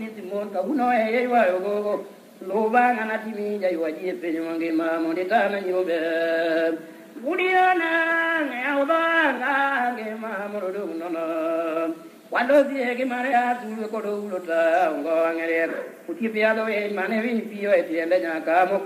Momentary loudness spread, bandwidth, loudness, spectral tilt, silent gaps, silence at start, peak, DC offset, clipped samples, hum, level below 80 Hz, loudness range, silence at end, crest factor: 10 LU; 15 kHz; -23 LUFS; -5.5 dB/octave; none; 0 s; -8 dBFS; under 0.1%; under 0.1%; none; -78 dBFS; 3 LU; 0 s; 16 dB